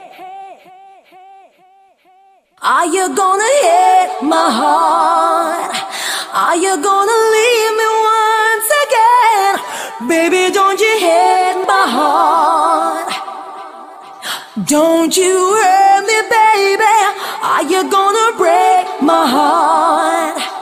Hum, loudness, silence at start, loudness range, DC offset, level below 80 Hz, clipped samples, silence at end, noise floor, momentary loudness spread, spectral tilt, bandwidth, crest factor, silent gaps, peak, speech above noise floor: none; -12 LUFS; 0 s; 4 LU; under 0.1%; -64 dBFS; under 0.1%; 0 s; -49 dBFS; 10 LU; -2 dB/octave; 15.5 kHz; 12 dB; none; 0 dBFS; 38 dB